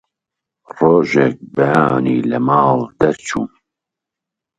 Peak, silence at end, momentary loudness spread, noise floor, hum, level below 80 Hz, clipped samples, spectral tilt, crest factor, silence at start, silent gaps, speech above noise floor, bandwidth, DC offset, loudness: 0 dBFS; 1.15 s; 9 LU; -84 dBFS; none; -52 dBFS; under 0.1%; -7 dB/octave; 16 dB; 0.75 s; none; 69 dB; 9.4 kHz; under 0.1%; -15 LUFS